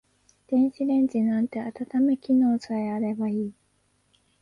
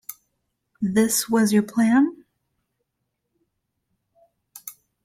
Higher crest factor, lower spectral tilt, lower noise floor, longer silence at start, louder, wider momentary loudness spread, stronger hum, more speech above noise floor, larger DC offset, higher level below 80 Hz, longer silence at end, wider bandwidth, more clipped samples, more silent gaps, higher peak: second, 12 dB vs 18 dB; first, -8 dB/octave vs -4.5 dB/octave; second, -68 dBFS vs -78 dBFS; first, 0.5 s vs 0.1 s; second, -25 LUFS vs -20 LUFS; second, 8 LU vs 21 LU; first, 50 Hz at -65 dBFS vs none; second, 44 dB vs 59 dB; neither; about the same, -68 dBFS vs -66 dBFS; first, 0.9 s vs 0.35 s; second, 7.2 kHz vs 16.5 kHz; neither; neither; second, -14 dBFS vs -8 dBFS